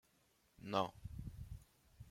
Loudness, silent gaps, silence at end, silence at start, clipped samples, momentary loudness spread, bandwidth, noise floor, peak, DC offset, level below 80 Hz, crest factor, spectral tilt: -45 LUFS; none; 0 s; 0.6 s; under 0.1%; 17 LU; 16.5 kHz; -76 dBFS; -20 dBFS; under 0.1%; -60 dBFS; 26 dB; -6 dB/octave